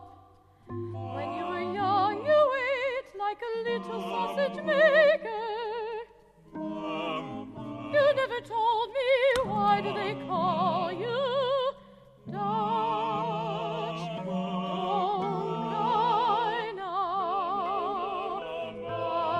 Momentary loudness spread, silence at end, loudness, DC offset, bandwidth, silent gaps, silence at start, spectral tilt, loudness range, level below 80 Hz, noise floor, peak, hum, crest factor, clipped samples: 12 LU; 0 s; -29 LUFS; under 0.1%; 11.5 kHz; none; 0 s; -6 dB/octave; 4 LU; -64 dBFS; -57 dBFS; -12 dBFS; none; 18 dB; under 0.1%